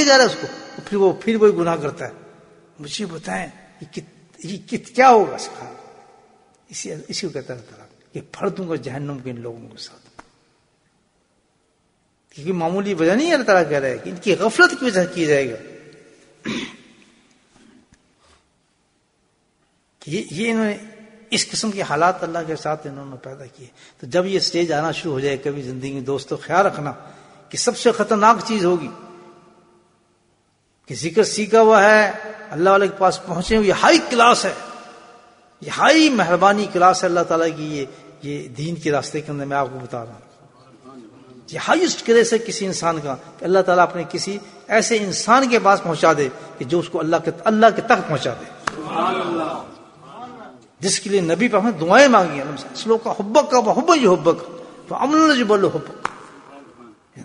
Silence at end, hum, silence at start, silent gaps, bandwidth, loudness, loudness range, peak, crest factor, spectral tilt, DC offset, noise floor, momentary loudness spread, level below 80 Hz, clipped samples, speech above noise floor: 0 s; none; 0 s; none; 11 kHz; -18 LUFS; 13 LU; 0 dBFS; 20 dB; -4 dB/octave; under 0.1%; -64 dBFS; 20 LU; -56 dBFS; under 0.1%; 46 dB